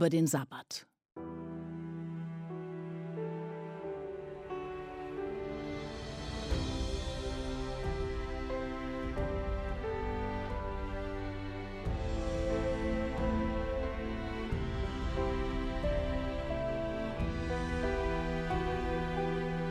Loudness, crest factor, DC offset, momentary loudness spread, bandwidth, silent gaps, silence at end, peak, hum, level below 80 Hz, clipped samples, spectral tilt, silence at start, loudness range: -37 LUFS; 20 dB; under 0.1%; 9 LU; 14 kHz; none; 0 s; -16 dBFS; none; -42 dBFS; under 0.1%; -6 dB/octave; 0 s; 6 LU